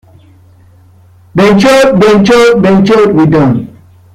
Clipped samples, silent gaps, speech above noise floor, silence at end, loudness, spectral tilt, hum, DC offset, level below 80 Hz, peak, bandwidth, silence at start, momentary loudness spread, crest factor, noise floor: under 0.1%; none; 35 dB; 0.5 s; -6 LUFS; -6.5 dB/octave; none; under 0.1%; -38 dBFS; 0 dBFS; 15 kHz; 1.35 s; 8 LU; 8 dB; -40 dBFS